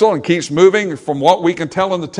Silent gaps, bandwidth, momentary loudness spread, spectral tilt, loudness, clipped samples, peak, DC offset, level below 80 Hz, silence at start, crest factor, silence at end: none; 11 kHz; 7 LU; -5.5 dB/octave; -14 LUFS; 0.2%; 0 dBFS; under 0.1%; -58 dBFS; 0 s; 14 dB; 0 s